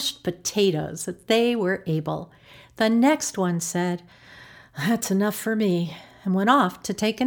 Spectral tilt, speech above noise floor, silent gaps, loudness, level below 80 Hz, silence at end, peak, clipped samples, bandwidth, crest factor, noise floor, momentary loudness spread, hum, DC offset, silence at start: -4.5 dB/octave; 24 dB; none; -24 LUFS; -62 dBFS; 0 s; -4 dBFS; under 0.1%; over 20 kHz; 20 dB; -47 dBFS; 13 LU; none; under 0.1%; 0 s